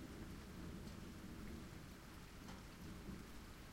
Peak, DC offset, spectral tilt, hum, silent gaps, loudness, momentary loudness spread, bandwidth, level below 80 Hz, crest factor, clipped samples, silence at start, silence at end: -40 dBFS; under 0.1%; -5 dB/octave; none; none; -55 LUFS; 4 LU; 16.5 kHz; -60 dBFS; 14 dB; under 0.1%; 0 s; 0 s